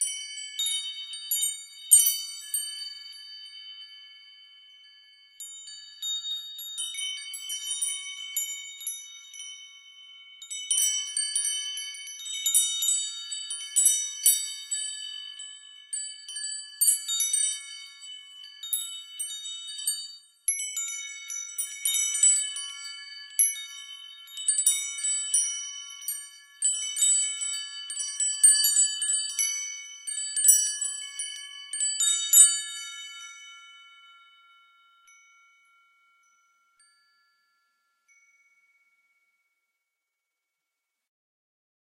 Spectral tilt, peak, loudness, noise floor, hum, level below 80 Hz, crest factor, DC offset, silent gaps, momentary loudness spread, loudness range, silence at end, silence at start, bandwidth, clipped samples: 11.5 dB/octave; -4 dBFS; -25 LUFS; -85 dBFS; none; under -90 dBFS; 26 dB; under 0.1%; none; 22 LU; 12 LU; 7.85 s; 0 s; 15.5 kHz; under 0.1%